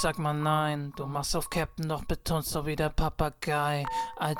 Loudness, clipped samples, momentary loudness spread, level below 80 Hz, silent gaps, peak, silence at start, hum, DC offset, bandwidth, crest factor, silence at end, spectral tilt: -30 LUFS; under 0.1%; 6 LU; -40 dBFS; none; -12 dBFS; 0 s; none; under 0.1%; 19 kHz; 18 dB; 0 s; -5 dB/octave